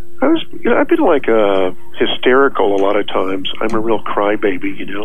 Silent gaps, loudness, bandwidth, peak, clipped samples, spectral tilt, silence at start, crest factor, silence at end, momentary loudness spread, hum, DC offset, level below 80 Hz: none; -15 LUFS; 12.5 kHz; 0 dBFS; under 0.1%; -6 dB/octave; 0.1 s; 14 dB; 0 s; 8 LU; none; 10%; -46 dBFS